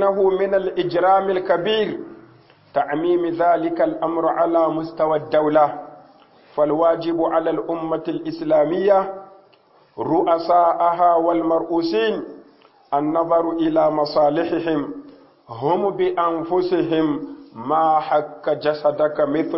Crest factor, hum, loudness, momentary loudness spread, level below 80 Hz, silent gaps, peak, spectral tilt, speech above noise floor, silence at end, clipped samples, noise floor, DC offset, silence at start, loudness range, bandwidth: 16 dB; none; -19 LUFS; 10 LU; -60 dBFS; none; -4 dBFS; -10.5 dB/octave; 35 dB; 0 s; under 0.1%; -54 dBFS; under 0.1%; 0 s; 2 LU; 5.8 kHz